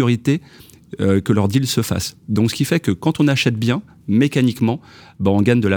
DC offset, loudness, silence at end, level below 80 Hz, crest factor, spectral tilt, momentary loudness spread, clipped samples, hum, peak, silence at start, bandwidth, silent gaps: under 0.1%; -18 LUFS; 0 s; -50 dBFS; 16 dB; -6 dB/octave; 7 LU; under 0.1%; none; -2 dBFS; 0 s; over 20 kHz; none